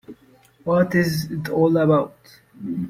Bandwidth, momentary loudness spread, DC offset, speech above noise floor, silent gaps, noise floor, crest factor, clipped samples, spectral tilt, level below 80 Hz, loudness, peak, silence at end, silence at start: 16.5 kHz; 15 LU; under 0.1%; 34 dB; none; -54 dBFS; 16 dB; under 0.1%; -7 dB/octave; -54 dBFS; -20 LUFS; -6 dBFS; 0 s; 0.1 s